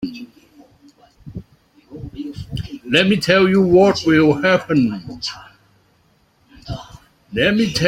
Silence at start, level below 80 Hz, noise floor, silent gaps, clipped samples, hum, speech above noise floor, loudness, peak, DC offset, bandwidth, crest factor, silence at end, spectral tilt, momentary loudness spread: 0 s; -46 dBFS; -58 dBFS; none; under 0.1%; none; 43 dB; -16 LUFS; -2 dBFS; under 0.1%; 15.5 kHz; 18 dB; 0 s; -5.5 dB/octave; 23 LU